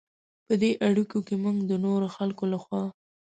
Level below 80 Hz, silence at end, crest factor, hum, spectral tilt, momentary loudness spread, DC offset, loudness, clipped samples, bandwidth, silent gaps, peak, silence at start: -70 dBFS; 0.3 s; 16 dB; none; -7.5 dB/octave; 8 LU; under 0.1%; -27 LUFS; under 0.1%; 9 kHz; none; -12 dBFS; 0.5 s